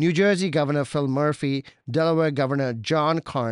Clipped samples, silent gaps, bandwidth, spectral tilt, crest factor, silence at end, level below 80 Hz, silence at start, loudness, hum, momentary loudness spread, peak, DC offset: under 0.1%; none; 11 kHz; -6.5 dB/octave; 14 dB; 0 s; -62 dBFS; 0 s; -23 LUFS; none; 6 LU; -8 dBFS; under 0.1%